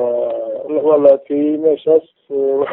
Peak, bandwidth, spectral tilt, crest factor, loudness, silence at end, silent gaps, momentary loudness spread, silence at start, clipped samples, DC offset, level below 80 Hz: 0 dBFS; 3.9 kHz; -10 dB/octave; 14 dB; -15 LUFS; 0 s; none; 9 LU; 0 s; under 0.1%; under 0.1%; -64 dBFS